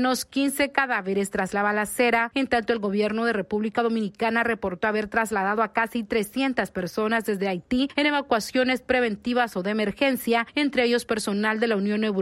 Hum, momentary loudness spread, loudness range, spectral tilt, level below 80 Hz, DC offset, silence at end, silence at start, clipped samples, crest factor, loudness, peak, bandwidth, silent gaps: none; 4 LU; 1 LU; -4.5 dB/octave; -56 dBFS; under 0.1%; 0 s; 0 s; under 0.1%; 16 dB; -24 LUFS; -8 dBFS; 16 kHz; none